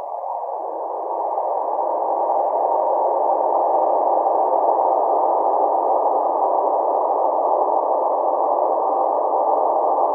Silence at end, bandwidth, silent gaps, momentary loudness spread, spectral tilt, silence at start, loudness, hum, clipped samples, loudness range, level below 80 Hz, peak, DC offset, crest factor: 0 s; 2.4 kHz; none; 6 LU; -8 dB/octave; 0 s; -19 LUFS; none; under 0.1%; 2 LU; under -90 dBFS; -4 dBFS; under 0.1%; 14 dB